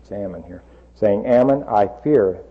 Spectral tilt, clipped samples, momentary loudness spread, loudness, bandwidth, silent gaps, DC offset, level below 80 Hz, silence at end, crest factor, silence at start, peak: -9.5 dB/octave; under 0.1%; 14 LU; -17 LUFS; 6.8 kHz; none; under 0.1%; -48 dBFS; 0.1 s; 14 dB; 0.1 s; -6 dBFS